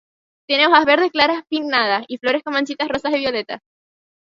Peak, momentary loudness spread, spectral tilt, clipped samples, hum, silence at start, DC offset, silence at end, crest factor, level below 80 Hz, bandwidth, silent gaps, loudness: 0 dBFS; 10 LU; -3.5 dB/octave; under 0.1%; none; 0.5 s; under 0.1%; 0.65 s; 20 dB; -58 dBFS; 7.6 kHz; none; -18 LUFS